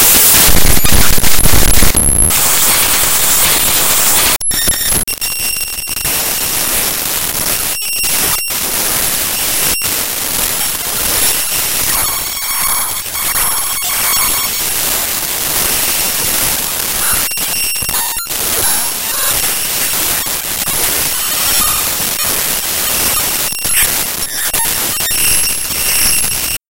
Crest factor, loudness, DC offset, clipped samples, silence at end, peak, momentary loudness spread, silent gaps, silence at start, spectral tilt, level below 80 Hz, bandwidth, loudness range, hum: 12 dB; -11 LUFS; under 0.1%; 0.4%; 0 s; 0 dBFS; 6 LU; none; 0 s; -1 dB/octave; -26 dBFS; over 20 kHz; 4 LU; none